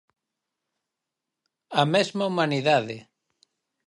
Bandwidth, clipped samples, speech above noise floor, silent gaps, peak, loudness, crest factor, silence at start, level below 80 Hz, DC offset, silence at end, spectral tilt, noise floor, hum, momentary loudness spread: 11.5 kHz; under 0.1%; 62 dB; none; -4 dBFS; -23 LUFS; 24 dB; 1.7 s; -76 dBFS; under 0.1%; 0.85 s; -5 dB/octave; -86 dBFS; none; 11 LU